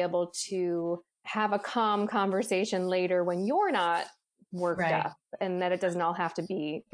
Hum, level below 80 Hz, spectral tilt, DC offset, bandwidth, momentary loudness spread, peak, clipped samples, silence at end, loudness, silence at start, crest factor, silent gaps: none; -76 dBFS; -5 dB/octave; under 0.1%; 10.5 kHz; 7 LU; -14 dBFS; under 0.1%; 0.15 s; -30 LUFS; 0 s; 16 dB; none